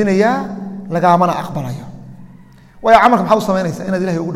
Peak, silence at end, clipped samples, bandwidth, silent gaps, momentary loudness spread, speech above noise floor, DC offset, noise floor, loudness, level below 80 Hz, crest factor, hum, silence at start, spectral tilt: 0 dBFS; 0 s; under 0.1%; 15.5 kHz; none; 16 LU; 28 dB; under 0.1%; -41 dBFS; -14 LUFS; -48 dBFS; 16 dB; none; 0 s; -6.5 dB/octave